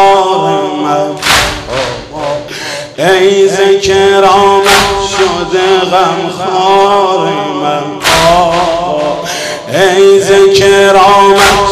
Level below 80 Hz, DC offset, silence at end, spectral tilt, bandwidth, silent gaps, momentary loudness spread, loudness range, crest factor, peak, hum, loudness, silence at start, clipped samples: -34 dBFS; under 0.1%; 0 s; -3.5 dB/octave; 15.5 kHz; none; 11 LU; 3 LU; 8 dB; 0 dBFS; none; -8 LUFS; 0 s; 0.9%